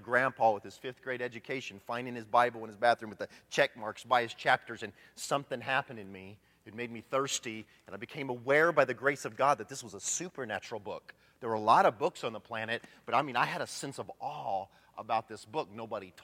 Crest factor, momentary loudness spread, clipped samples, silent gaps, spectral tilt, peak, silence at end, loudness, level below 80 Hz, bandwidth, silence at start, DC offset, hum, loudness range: 24 dB; 17 LU; under 0.1%; none; -3.5 dB/octave; -10 dBFS; 0.05 s; -32 LUFS; -78 dBFS; 16.5 kHz; 0 s; under 0.1%; none; 4 LU